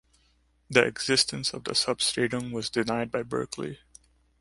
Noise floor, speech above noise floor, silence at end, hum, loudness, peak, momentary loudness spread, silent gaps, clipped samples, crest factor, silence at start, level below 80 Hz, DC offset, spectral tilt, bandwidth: -66 dBFS; 39 dB; 0.65 s; none; -27 LUFS; -4 dBFS; 11 LU; none; under 0.1%; 26 dB; 0.7 s; -60 dBFS; under 0.1%; -3 dB/octave; 11.5 kHz